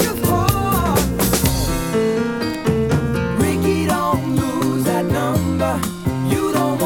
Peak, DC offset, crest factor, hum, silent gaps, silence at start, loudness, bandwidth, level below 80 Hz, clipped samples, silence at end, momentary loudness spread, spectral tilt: -2 dBFS; under 0.1%; 16 dB; none; none; 0 s; -18 LUFS; 19.5 kHz; -32 dBFS; under 0.1%; 0 s; 3 LU; -5.5 dB/octave